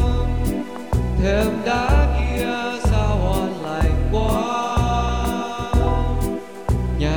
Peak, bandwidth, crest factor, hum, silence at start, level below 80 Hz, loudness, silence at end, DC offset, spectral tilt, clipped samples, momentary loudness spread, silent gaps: -4 dBFS; over 20 kHz; 16 dB; none; 0 s; -22 dBFS; -21 LUFS; 0 s; 0.8%; -6.5 dB/octave; under 0.1%; 6 LU; none